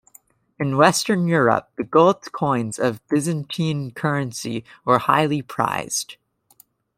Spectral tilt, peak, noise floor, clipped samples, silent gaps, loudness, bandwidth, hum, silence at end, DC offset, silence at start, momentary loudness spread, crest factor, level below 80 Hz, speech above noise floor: -5 dB/octave; -2 dBFS; -56 dBFS; under 0.1%; none; -21 LUFS; 16 kHz; none; 0.85 s; under 0.1%; 0.6 s; 10 LU; 20 dB; -62 dBFS; 36 dB